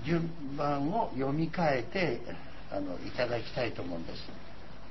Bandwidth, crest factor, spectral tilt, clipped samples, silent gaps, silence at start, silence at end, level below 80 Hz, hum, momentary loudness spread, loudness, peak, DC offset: 6 kHz; 16 dB; -7.5 dB/octave; under 0.1%; none; 0 s; 0 s; -54 dBFS; none; 15 LU; -34 LUFS; -16 dBFS; 1%